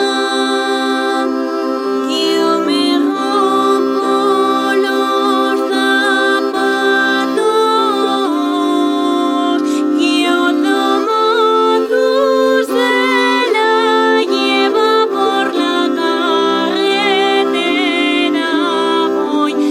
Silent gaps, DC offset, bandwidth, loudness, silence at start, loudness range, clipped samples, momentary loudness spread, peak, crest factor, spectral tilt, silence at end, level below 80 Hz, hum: none; under 0.1%; 16 kHz; -13 LUFS; 0 s; 2 LU; under 0.1%; 3 LU; -2 dBFS; 12 dB; -3 dB/octave; 0 s; -64 dBFS; none